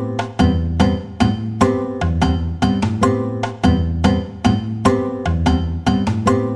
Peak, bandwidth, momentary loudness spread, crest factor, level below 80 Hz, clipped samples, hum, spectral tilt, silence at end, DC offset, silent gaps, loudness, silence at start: -2 dBFS; 11 kHz; 3 LU; 14 dB; -28 dBFS; under 0.1%; none; -7 dB/octave; 0 s; under 0.1%; none; -18 LUFS; 0 s